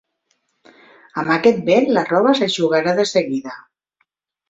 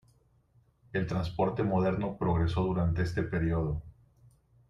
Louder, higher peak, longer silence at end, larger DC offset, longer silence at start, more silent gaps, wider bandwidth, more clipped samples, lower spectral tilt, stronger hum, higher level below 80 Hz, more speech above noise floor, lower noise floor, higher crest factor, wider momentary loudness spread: first, -17 LUFS vs -31 LUFS; first, -2 dBFS vs -16 dBFS; about the same, 0.9 s vs 0.8 s; neither; first, 1.15 s vs 0.95 s; neither; about the same, 8 kHz vs 7.4 kHz; neither; second, -5 dB/octave vs -8.5 dB/octave; neither; second, -62 dBFS vs -46 dBFS; first, 52 dB vs 37 dB; about the same, -69 dBFS vs -66 dBFS; about the same, 18 dB vs 16 dB; first, 12 LU vs 6 LU